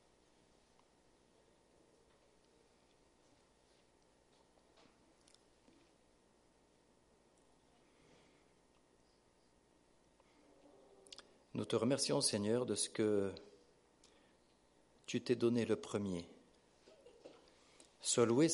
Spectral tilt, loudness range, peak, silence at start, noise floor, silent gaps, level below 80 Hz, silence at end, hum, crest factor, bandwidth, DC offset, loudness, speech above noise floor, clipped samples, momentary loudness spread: -4 dB/octave; 4 LU; -20 dBFS; 11.55 s; -72 dBFS; none; -80 dBFS; 0 s; 60 Hz at -75 dBFS; 22 dB; 11.5 kHz; under 0.1%; -37 LUFS; 36 dB; under 0.1%; 22 LU